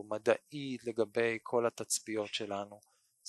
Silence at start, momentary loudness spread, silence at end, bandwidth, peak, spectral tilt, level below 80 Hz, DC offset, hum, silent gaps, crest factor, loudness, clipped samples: 0 s; 8 LU; 0 s; 12.5 kHz; -14 dBFS; -3 dB/octave; -78 dBFS; under 0.1%; none; none; 22 dB; -35 LUFS; under 0.1%